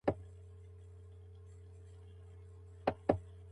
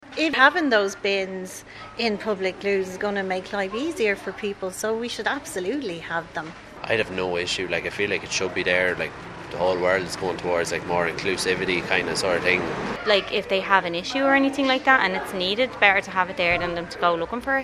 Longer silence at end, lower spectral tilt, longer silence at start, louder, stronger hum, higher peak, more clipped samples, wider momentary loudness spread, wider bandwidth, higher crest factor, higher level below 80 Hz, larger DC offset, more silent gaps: about the same, 0 s vs 0 s; first, -8.5 dB/octave vs -3.5 dB/octave; about the same, 0.05 s vs 0 s; second, -38 LUFS vs -23 LUFS; neither; second, -12 dBFS vs 0 dBFS; neither; first, 19 LU vs 11 LU; second, 11 kHz vs 14 kHz; first, 30 dB vs 22 dB; about the same, -56 dBFS vs -52 dBFS; neither; neither